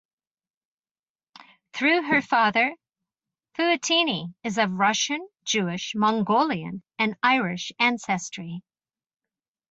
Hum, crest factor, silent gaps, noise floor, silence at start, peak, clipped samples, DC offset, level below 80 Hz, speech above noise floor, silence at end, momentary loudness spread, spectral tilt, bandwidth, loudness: none; 20 dB; none; under -90 dBFS; 1.75 s; -6 dBFS; under 0.1%; under 0.1%; -70 dBFS; over 66 dB; 1.1 s; 12 LU; -3.5 dB/octave; 8.2 kHz; -23 LUFS